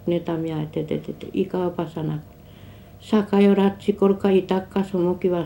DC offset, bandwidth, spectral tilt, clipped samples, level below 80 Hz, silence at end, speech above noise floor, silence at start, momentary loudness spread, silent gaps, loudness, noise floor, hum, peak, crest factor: under 0.1%; 16.5 kHz; -8.5 dB/octave; under 0.1%; -52 dBFS; 0 s; 22 dB; 0 s; 12 LU; none; -22 LUFS; -44 dBFS; none; -6 dBFS; 16 dB